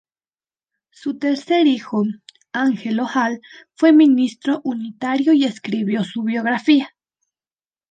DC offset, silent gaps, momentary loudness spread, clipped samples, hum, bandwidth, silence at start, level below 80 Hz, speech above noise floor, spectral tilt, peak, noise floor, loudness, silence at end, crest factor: under 0.1%; none; 12 LU; under 0.1%; none; 9 kHz; 1.05 s; -72 dBFS; over 72 dB; -6 dB/octave; -4 dBFS; under -90 dBFS; -18 LUFS; 1.05 s; 16 dB